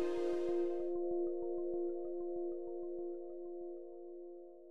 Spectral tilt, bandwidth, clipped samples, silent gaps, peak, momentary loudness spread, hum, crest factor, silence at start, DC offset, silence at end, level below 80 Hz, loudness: -7 dB/octave; 6.2 kHz; under 0.1%; none; -26 dBFS; 14 LU; none; 14 dB; 0 s; 0.3%; 0 s; -78 dBFS; -41 LUFS